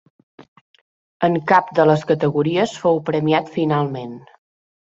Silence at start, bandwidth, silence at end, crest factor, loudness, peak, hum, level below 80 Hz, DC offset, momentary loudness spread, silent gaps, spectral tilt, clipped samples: 1.2 s; 7.8 kHz; 0.65 s; 20 dB; -18 LUFS; 0 dBFS; none; -62 dBFS; under 0.1%; 9 LU; none; -7 dB/octave; under 0.1%